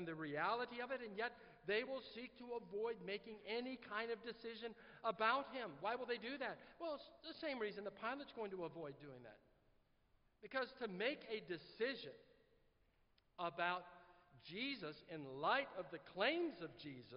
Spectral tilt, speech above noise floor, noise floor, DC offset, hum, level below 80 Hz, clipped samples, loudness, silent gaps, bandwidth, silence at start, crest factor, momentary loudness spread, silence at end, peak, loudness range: -2 dB/octave; 32 dB; -78 dBFS; under 0.1%; none; -80 dBFS; under 0.1%; -46 LUFS; none; 5.6 kHz; 0 s; 22 dB; 14 LU; 0 s; -24 dBFS; 5 LU